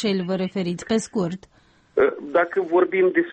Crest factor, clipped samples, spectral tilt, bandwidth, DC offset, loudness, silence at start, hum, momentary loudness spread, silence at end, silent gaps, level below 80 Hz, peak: 14 dB; under 0.1%; -6 dB/octave; 8.8 kHz; under 0.1%; -22 LUFS; 0 s; none; 8 LU; 0 s; none; -60 dBFS; -8 dBFS